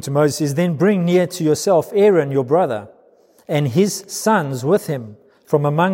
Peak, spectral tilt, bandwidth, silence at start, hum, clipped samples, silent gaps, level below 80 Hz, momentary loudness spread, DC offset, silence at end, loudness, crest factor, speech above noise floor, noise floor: -2 dBFS; -6 dB/octave; 16.5 kHz; 0 s; none; under 0.1%; none; -66 dBFS; 7 LU; under 0.1%; 0 s; -17 LUFS; 16 dB; 36 dB; -52 dBFS